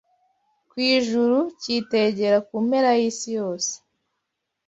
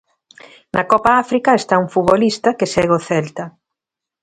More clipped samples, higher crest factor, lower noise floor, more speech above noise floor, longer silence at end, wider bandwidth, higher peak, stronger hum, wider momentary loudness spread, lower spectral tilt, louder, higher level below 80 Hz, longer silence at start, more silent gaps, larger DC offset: neither; about the same, 16 dB vs 16 dB; second, -80 dBFS vs -85 dBFS; second, 58 dB vs 69 dB; first, 0.9 s vs 0.75 s; second, 8 kHz vs 11.5 kHz; second, -8 dBFS vs 0 dBFS; neither; about the same, 8 LU vs 9 LU; second, -3.5 dB/octave vs -5.5 dB/octave; second, -22 LUFS vs -15 LUFS; second, -70 dBFS vs -50 dBFS; about the same, 0.75 s vs 0.75 s; neither; neither